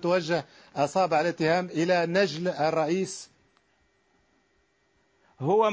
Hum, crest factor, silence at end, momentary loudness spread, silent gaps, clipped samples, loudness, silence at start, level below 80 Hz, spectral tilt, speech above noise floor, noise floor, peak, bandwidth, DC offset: none; 16 dB; 0 s; 10 LU; none; under 0.1%; -26 LUFS; 0 s; -70 dBFS; -5.5 dB/octave; 44 dB; -69 dBFS; -10 dBFS; 8 kHz; under 0.1%